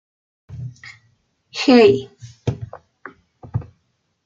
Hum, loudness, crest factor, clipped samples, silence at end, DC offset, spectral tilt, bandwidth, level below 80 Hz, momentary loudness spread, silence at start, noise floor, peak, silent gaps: none; -17 LUFS; 20 dB; under 0.1%; 0.65 s; under 0.1%; -6.5 dB/octave; 7.6 kHz; -54 dBFS; 28 LU; 0.5 s; -68 dBFS; -2 dBFS; none